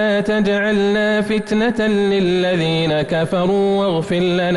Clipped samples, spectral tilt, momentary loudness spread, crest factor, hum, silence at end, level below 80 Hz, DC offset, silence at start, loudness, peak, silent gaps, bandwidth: under 0.1%; -6.5 dB/octave; 2 LU; 8 dB; none; 0 s; -46 dBFS; under 0.1%; 0 s; -17 LUFS; -8 dBFS; none; 11.5 kHz